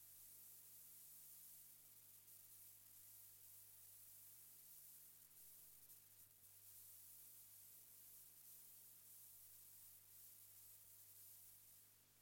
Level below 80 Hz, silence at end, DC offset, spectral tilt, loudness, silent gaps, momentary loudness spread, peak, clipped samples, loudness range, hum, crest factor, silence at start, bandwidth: under -90 dBFS; 0 s; under 0.1%; -0.5 dB/octave; -61 LUFS; none; 3 LU; -50 dBFS; under 0.1%; 1 LU; 50 Hz at -85 dBFS; 16 dB; 0 s; 17 kHz